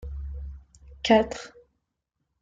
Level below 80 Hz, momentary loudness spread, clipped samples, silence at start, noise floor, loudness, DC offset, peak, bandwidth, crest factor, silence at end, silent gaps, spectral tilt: -42 dBFS; 21 LU; under 0.1%; 0 s; -80 dBFS; -24 LUFS; under 0.1%; -8 dBFS; 9 kHz; 22 dB; 0.9 s; none; -5 dB/octave